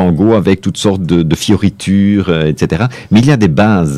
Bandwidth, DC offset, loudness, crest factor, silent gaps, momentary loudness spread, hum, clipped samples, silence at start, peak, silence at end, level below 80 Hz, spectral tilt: 13.5 kHz; under 0.1%; -11 LUFS; 10 dB; none; 4 LU; none; under 0.1%; 0 s; 0 dBFS; 0 s; -34 dBFS; -6.5 dB/octave